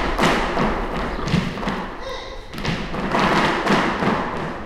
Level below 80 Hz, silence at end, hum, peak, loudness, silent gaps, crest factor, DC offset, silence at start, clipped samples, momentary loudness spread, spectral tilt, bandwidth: -32 dBFS; 0 s; none; -4 dBFS; -21 LUFS; none; 18 dB; under 0.1%; 0 s; under 0.1%; 12 LU; -5.5 dB/octave; 15 kHz